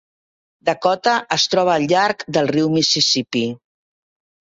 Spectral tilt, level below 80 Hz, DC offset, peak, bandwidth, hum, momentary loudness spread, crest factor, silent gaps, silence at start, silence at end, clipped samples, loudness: -3.5 dB/octave; -60 dBFS; under 0.1%; -2 dBFS; 8 kHz; none; 8 LU; 18 dB; none; 0.65 s; 0.95 s; under 0.1%; -17 LUFS